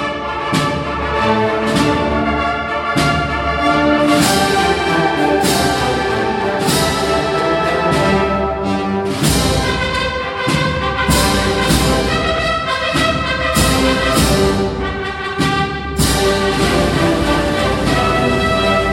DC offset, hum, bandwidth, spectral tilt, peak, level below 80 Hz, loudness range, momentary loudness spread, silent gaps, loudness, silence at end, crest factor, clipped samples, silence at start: under 0.1%; none; 16.5 kHz; -4.5 dB/octave; 0 dBFS; -28 dBFS; 2 LU; 5 LU; none; -15 LUFS; 0 s; 14 dB; under 0.1%; 0 s